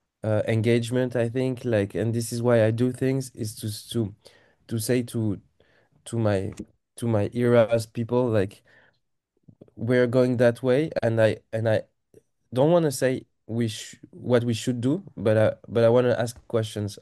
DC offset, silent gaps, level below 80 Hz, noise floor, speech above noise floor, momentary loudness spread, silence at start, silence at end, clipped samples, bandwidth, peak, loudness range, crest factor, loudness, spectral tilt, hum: under 0.1%; none; -62 dBFS; -75 dBFS; 51 dB; 12 LU; 0.25 s; 0.05 s; under 0.1%; 12.5 kHz; -6 dBFS; 5 LU; 18 dB; -24 LUFS; -6.5 dB/octave; none